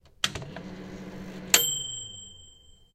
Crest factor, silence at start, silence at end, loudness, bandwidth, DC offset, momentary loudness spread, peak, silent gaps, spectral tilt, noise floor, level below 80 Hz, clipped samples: 32 dB; 0.05 s; 0.4 s; -25 LUFS; 16 kHz; under 0.1%; 20 LU; 0 dBFS; none; -0.5 dB/octave; -54 dBFS; -56 dBFS; under 0.1%